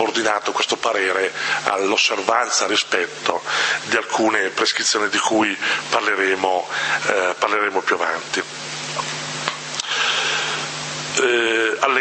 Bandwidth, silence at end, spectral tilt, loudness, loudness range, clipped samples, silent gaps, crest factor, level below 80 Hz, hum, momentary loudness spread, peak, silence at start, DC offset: 8.8 kHz; 0 s; -1.5 dB/octave; -19 LUFS; 3 LU; under 0.1%; none; 20 dB; -68 dBFS; none; 7 LU; 0 dBFS; 0 s; under 0.1%